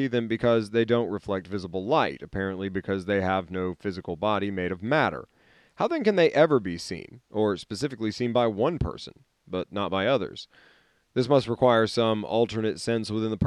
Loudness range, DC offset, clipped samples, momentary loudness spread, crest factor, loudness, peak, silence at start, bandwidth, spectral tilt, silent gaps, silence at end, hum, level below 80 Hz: 3 LU; under 0.1%; under 0.1%; 12 LU; 20 dB; -26 LUFS; -8 dBFS; 0 s; 12 kHz; -6 dB/octave; none; 0 s; none; -54 dBFS